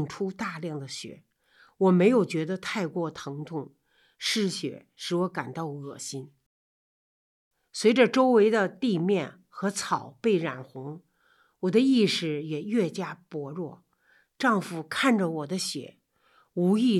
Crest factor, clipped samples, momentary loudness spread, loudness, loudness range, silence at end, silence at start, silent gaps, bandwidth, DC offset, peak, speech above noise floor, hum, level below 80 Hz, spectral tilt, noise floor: 18 dB; under 0.1%; 17 LU; -27 LUFS; 7 LU; 0 s; 0 s; 6.46-7.51 s; 13.5 kHz; under 0.1%; -8 dBFS; 39 dB; none; -76 dBFS; -5.5 dB/octave; -66 dBFS